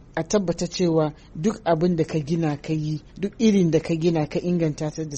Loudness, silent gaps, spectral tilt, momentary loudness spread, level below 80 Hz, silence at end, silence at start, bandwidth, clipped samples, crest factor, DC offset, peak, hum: -23 LUFS; none; -6.5 dB/octave; 7 LU; -48 dBFS; 0 s; 0 s; 8.4 kHz; under 0.1%; 16 dB; under 0.1%; -6 dBFS; none